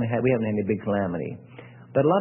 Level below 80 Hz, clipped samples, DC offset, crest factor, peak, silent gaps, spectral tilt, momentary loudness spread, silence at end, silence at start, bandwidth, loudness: -58 dBFS; under 0.1%; under 0.1%; 16 dB; -10 dBFS; none; -12.5 dB/octave; 19 LU; 0 s; 0 s; 3.4 kHz; -25 LUFS